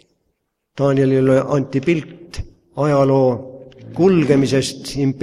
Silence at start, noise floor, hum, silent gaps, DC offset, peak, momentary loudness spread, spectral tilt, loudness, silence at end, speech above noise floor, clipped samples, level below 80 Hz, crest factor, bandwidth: 0.75 s; -71 dBFS; none; none; under 0.1%; -2 dBFS; 19 LU; -7 dB/octave; -17 LUFS; 0 s; 55 dB; under 0.1%; -44 dBFS; 16 dB; 13 kHz